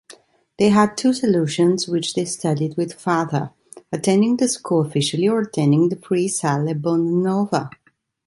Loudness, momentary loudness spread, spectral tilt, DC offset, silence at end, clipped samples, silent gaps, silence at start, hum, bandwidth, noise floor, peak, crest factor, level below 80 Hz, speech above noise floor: -20 LUFS; 7 LU; -5.5 dB/octave; under 0.1%; 0.6 s; under 0.1%; none; 0.1 s; none; 11.5 kHz; -49 dBFS; -2 dBFS; 16 dB; -62 dBFS; 30 dB